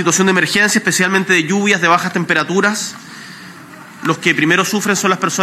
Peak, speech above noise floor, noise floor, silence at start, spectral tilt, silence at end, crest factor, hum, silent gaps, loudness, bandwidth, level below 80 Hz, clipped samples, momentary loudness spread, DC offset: 0 dBFS; 22 dB; -36 dBFS; 0 s; -3.5 dB/octave; 0 s; 16 dB; none; none; -13 LUFS; 15.5 kHz; -60 dBFS; under 0.1%; 20 LU; under 0.1%